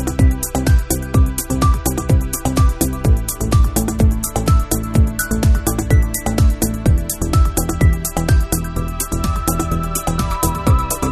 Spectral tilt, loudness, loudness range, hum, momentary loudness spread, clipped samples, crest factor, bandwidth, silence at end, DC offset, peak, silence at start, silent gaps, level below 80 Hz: -5.5 dB/octave; -17 LUFS; 2 LU; none; 4 LU; under 0.1%; 14 dB; 14 kHz; 0 s; under 0.1%; -2 dBFS; 0 s; none; -20 dBFS